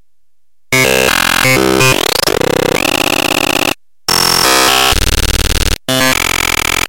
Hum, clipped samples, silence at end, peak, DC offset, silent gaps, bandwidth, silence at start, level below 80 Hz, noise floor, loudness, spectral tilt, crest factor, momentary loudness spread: none; under 0.1%; 0 s; -2 dBFS; under 0.1%; none; 17.5 kHz; 0 s; -24 dBFS; -72 dBFS; -10 LUFS; -2.5 dB/octave; 12 dB; 6 LU